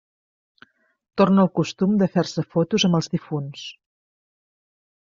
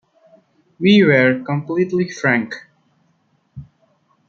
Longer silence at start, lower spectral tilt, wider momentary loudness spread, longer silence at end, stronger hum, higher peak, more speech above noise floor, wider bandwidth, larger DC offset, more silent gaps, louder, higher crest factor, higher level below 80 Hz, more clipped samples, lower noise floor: first, 1.15 s vs 0.8 s; about the same, -6 dB/octave vs -6.5 dB/octave; first, 15 LU vs 11 LU; first, 1.35 s vs 0.65 s; neither; about the same, -4 dBFS vs -2 dBFS; second, 35 dB vs 47 dB; about the same, 7.4 kHz vs 7 kHz; neither; neither; second, -21 LUFS vs -16 LUFS; about the same, 18 dB vs 18 dB; about the same, -62 dBFS vs -60 dBFS; neither; second, -55 dBFS vs -62 dBFS